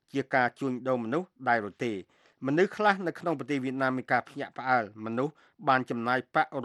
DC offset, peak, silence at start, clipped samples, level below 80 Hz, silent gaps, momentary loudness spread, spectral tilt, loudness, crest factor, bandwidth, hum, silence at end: under 0.1%; -8 dBFS; 0.15 s; under 0.1%; -78 dBFS; none; 8 LU; -6.5 dB/octave; -29 LUFS; 22 dB; 12 kHz; none; 0 s